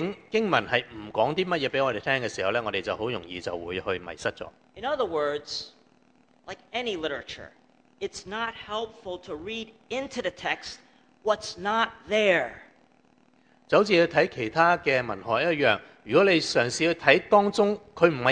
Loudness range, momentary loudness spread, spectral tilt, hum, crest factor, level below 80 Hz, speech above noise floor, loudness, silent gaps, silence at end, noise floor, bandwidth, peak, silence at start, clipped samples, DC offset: 11 LU; 15 LU; -4.5 dB/octave; none; 26 dB; -60 dBFS; 36 dB; -26 LUFS; none; 0 s; -62 dBFS; 10 kHz; -2 dBFS; 0 s; under 0.1%; under 0.1%